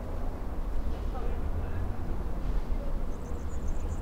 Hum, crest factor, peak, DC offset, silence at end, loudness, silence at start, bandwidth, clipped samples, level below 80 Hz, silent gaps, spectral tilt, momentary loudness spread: none; 12 dB; -18 dBFS; under 0.1%; 0 s; -37 LUFS; 0 s; 8.2 kHz; under 0.1%; -32 dBFS; none; -7.5 dB/octave; 3 LU